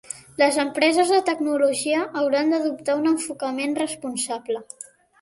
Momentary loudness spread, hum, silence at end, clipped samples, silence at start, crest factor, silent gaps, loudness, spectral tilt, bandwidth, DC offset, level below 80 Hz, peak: 11 LU; none; 0.4 s; under 0.1%; 0.1 s; 18 dB; none; -22 LUFS; -2.5 dB/octave; 11.5 kHz; under 0.1%; -70 dBFS; -4 dBFS